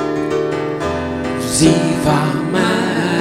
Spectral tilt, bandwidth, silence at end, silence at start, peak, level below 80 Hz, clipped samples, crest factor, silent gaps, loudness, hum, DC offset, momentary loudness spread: -5 dB/octave; 16 kHz; 0 s; 0 s; 0 dBFS; -40 dBFS; under 0.1%; 16 dB; none; -16 LUFS; none; 0.2%; 8 LU